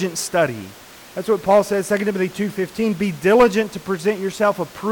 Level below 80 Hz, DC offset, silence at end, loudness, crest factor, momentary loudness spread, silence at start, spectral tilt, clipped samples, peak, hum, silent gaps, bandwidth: -52 dBFS; under 0.1%; 0 s; -19 LUFS; 14 dB; 10 LU; 0 s; -5 dB/octave; under 0.1%; -6 dBFS; none; none; 19 kHz